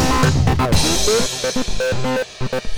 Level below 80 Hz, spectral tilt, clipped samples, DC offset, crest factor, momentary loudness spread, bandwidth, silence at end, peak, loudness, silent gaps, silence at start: -26 dBFS; -4 dB/octave; under 0.1%; 4%; 14 dB; 7 LU; over 20 kHz; 0 s; -4 dBFS; -18 LUFS; none; 0 s